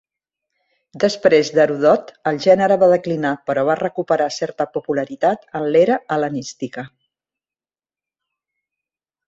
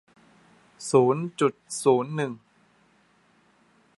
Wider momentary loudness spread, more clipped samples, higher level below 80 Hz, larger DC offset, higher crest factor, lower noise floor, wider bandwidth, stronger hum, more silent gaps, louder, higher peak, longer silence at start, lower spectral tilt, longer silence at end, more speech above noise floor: second, 10 LU vs 13 LU; neither; first, -64 dBFS vs -76 dBFS; neither; about the same, 18 dB vs 22 dB; first, under -90 dBFS vs -63 dBFS; second, 7.8 kHz vs 11.5 kHz; neither; neither; first, -18 LUFS vs -24 LUFS; first, -2 dBFS vs -6 dBFS; first, 0.95 s vs 0.8 s; about the same, -5.5 dB/octave vs -5.5 dB/octave; first, 2.4 s vs 1.6 s; first, over 73 dB vs 39 dB